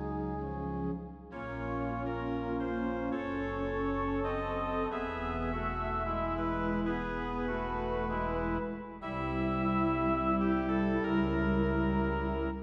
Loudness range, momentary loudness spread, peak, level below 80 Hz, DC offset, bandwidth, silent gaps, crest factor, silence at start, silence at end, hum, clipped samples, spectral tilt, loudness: 5 LU; 7 LU; -18 dBFS; -42 dBFS; under 0.1%; 6.4 kHz; none; 14 dB; 0 s; 0 s; none; under 0.1%; -9 dB/octave; -33 LUFS